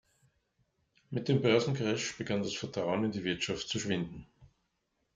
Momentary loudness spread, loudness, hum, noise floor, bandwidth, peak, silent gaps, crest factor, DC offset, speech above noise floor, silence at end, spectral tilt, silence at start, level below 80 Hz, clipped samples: 9 LU; -33 LUFS; none; -80 dBFS; 9.4 kHz; -14 dBFS; none; 20 dB; under 0.1%; 48 dB; 0.7 s; -5 dB/octave; 1.1 s; -64 dBFS; under 0.1%